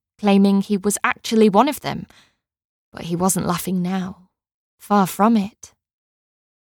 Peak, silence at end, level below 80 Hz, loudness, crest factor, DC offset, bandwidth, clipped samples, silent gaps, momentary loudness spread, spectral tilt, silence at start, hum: -2 dBFS; 1.05 s; -56 dBFS; -19 LUFS; 18 dB; under 0.1%; 19 kHz; under 0.1%; 2.65-2.92 s, 4.54-4.78 s; 13 LU; -5.5 dB/octave; 0.2 s; none